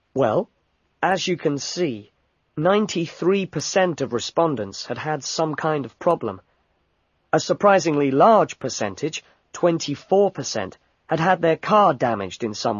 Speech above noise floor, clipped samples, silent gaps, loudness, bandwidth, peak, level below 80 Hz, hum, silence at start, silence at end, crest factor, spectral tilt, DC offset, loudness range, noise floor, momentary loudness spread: 47 dB; under 0.1%; none; -21 LUFS; 7.4 kHz; -2 dBFS; -60 dBFS; none; 0.15 s; 0 s; 20 dB; -5 dB/octave; under 0.1%; 4 LU; -68 dBFS; 12 LU